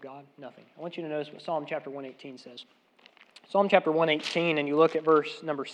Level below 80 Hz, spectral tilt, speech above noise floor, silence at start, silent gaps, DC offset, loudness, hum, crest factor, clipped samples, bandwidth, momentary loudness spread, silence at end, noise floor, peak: under -90 dBFS; -5.5 dB/octave; 30 dB; 0 s; none; under 0.1%; -27 LUFS; none; 24 dB; under 0.1%; 9.8 kHz; 23 LU; 0 s; -59 dBFS; -6 dBFS